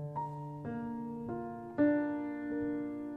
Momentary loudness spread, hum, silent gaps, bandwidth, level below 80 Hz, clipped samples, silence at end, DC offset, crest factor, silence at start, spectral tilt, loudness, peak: 11 LU; none; none; 3.8 kHz; -66 dBFS; under 0.1%; 0 s; under 0.1%; 18 dB; 0 s; -10 dB/octave; -37 LUFS; -18 dBFS